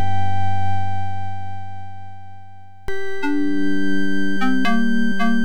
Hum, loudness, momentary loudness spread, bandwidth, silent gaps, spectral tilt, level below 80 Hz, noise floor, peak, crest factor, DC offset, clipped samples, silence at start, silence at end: 50 Hz at -65 dBFS; -23 LUFS; 18 LU; 15 kHz; none; -6.5 dB/octave; -46 dBFS; -44 dBFS; -8 dBFS; 10 dB; 10%; under 0.1%; 0 s; 0 s